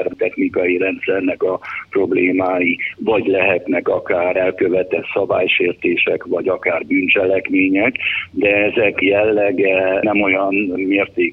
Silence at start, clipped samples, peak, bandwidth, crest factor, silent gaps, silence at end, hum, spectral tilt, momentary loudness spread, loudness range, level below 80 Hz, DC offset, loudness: 0 s; under 0.1%; -2 dBFS; 4.5 kHz; 16 dB; none; 0 s; none; -8 dB/octave; 5 LU; 2 LU; -54 dBFS; under 0.1%; -16 LUFS